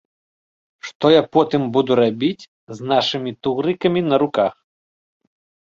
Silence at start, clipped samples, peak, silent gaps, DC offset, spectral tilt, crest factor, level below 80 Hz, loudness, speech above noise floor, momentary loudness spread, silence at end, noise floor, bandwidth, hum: 0.85 s; under 0.1%; -2 dBFS; 0.95-1.00 s, 2.48-2.67 s; under 0.1%; -6.5 dB/octave; 18 dB; -60 dBFS; -18 LUFS; over 72 dB; 17 LU; 1.1 s; under -90 dBFS; 7.4 kHz; none